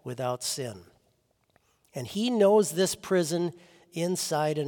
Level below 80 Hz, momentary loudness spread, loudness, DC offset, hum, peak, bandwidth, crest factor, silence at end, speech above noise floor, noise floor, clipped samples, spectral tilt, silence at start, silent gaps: -72 dBFS; 16 LU; -27 LUFS; under 0.1%; none; -12 dBFS; 18 kHz; 18 dB; 0 s; 43 dB; -70 dBFS; under 0.1%; -4.5 dB/octave; 0.05 s; none